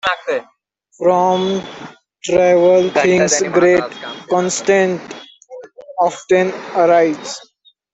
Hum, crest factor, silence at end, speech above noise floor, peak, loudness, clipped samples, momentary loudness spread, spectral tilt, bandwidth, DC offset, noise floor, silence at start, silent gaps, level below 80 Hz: none; 14 dB; 0.55 s; 22 dB; -2 dBFS; -15 LUFS; under 0.1%; 18 LU; -4 dB/octave; 8.4 kHz; under 0.1%; -37 dBFS; 0.05 s; none; -58 dBFS